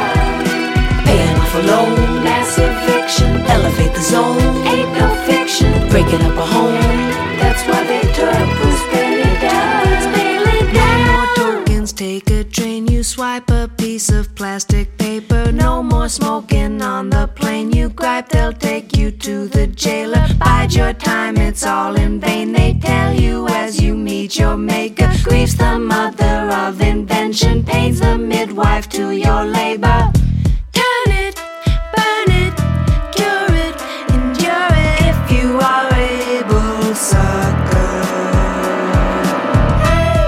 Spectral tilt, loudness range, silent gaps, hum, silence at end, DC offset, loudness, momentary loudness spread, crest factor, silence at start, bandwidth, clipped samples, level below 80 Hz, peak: -5.5 dB/octave; 3 LU; none; none; 0 s; under 0.1%; -15 LUFS; 5 LU; 12 dB; 0 s; 16 kHz; under 0.1%; -20 dBFS; 0 dBFS